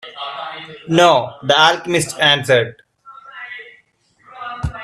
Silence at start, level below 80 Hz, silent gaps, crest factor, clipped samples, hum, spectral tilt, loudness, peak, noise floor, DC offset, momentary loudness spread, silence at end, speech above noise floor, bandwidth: 0.05 s; -42 dBFS; none; 18 dB; under 0.1%; none; -3.5 dB/octave; -15 LUFS; 0 dBFS; -56 dBFS; under 0.1%; 20 LU; 0 s; 41 dB; 14.5 kHz